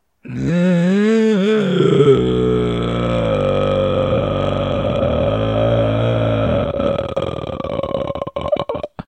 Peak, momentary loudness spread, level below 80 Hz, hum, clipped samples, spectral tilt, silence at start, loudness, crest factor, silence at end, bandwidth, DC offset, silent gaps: 0 dBFS; 9 LU; -34 dBFS; none; under 0.1%; -8 dB/octave; 0.25 s; -17 LUFS; 16 dB; 0.05 s; 9 kHz; under 0.1%; none